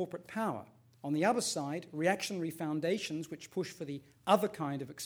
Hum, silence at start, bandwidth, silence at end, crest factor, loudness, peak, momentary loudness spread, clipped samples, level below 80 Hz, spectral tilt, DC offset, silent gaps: none; 0 s; over 20 kHz; 0 s; 24 dB; -35 LUFS; -12 dBFS; 11 LU; under 0.1%; -76 dBFS; -4.5 dB/octave; under 0.1%; none